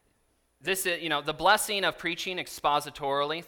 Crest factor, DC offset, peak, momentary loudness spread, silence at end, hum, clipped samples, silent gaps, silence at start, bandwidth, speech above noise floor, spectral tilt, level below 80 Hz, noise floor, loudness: 22 dB; under 0.1%; -8 dBFS; 8 LU; 0 s; none; under 0.1%; none; 0.65 s; 19 kHz; 42 dB; -2 dB/octave; -60 dBFS; -71 dBFS; -28 LUFS